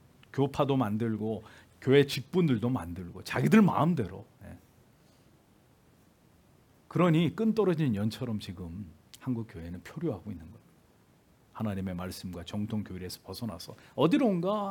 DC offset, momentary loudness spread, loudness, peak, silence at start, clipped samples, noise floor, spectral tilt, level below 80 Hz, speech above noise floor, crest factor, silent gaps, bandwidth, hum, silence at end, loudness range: under 0.1%; 18 LU; -30 LUFS; -10 dBFS; 0.35 s; under 0.1%; -63 dBFS; -7 dB/octave; -64 dBFS; 34 dB; 22 dB; none; 18 kHz; none; 0 s; 11 LU